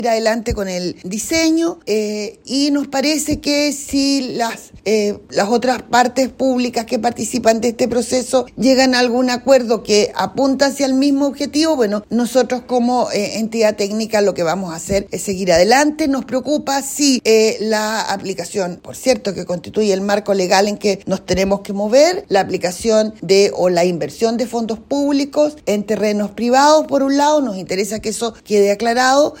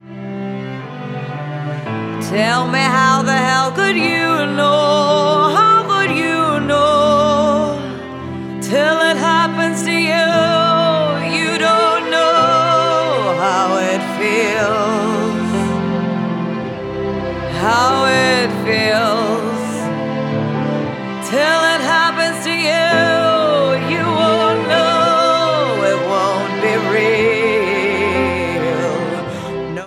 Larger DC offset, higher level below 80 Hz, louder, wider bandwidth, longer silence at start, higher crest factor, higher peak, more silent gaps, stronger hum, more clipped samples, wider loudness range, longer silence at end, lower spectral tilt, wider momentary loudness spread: neither; about the same, -46 dBFS vs -48 dBFS; about the same, -16 LUFS vs -15 LUFS; about the same, 16.5 kHz vs 16.5 kHz; about the same, 0 s vs 0.05 s; about the same, 16 dB vs 14 dB; about the same, 0 dBFS vs 0 dBFS; neither; neither; neither; about the same, 3 LU vs 4 LU; about the same, 0 s vs 0 s; about the same, -4 dB/octave vs -4.5 dB/octave; second, 8 LU vs 11 LU